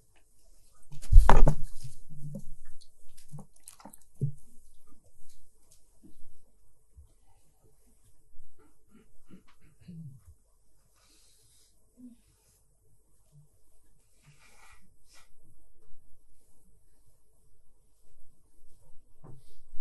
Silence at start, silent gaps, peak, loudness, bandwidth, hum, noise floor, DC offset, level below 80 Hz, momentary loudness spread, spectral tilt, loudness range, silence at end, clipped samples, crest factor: 0.8 s; none; -2 dBFS; -29 LUFS; 11.5 kHz; none; -65 dBFS; under 0.1%; -34 dBFS; 33 LU; -6.5 dB/octave; 30 LU; 0 s; under 0.1%; 24 dB